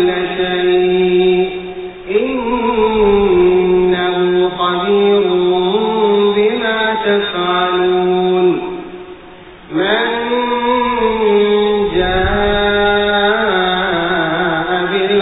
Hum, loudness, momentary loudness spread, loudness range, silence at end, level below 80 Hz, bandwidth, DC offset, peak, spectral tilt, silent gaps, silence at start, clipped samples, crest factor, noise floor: none; -13 LUFS; 5 LU; 3 LU; 0 s; -36 dBFS; 4 kHz; under 0.1%; -2 dBFS; -11 dB/octave; none; 0 s; under 0.1%; 12 dB; -36 dBFS